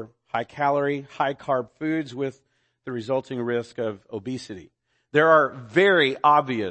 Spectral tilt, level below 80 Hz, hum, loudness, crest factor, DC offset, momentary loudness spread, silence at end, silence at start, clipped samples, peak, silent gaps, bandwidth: -6 dB/octave; -68 dBFS; none; -23 LUFS; 20 dB; under 0.1%; 16 LU; 0 s; 0 s; under 0.1%; -4 dBFS; none; 8.8 kHz